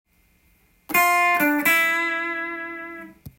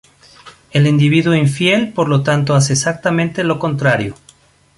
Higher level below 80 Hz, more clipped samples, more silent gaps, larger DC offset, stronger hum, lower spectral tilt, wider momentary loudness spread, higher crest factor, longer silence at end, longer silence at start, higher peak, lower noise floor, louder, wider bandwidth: second, -62 dBFS vs -50 dBFS; neither; neither; neither; neither; second, -2 dB/octave vs -5.5 dB/octave; first, 17 LU vs 5 LU; about the same, 18 dB vs 14 dB; second, 0.1 s vs 0.65 s; first, 0.9 s vs 0.45 s; second, -6 dBFS vs 0 dBFS; first, -61 dBFS vs -49 dBFS; second, -20 LUFS vs -14 LUFS; first, 17 kHz vs 11.5 kHz